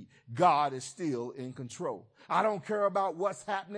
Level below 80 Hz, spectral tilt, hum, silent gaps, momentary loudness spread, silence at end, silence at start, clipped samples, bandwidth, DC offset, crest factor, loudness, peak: -82 dBFS; -5 dB/octave; none; none; 15 LU; 0 s; 0 s; under 0.1%; 10.5 kHz; under 0.1%; 20 dB; -31 LUFS; -12 dBFS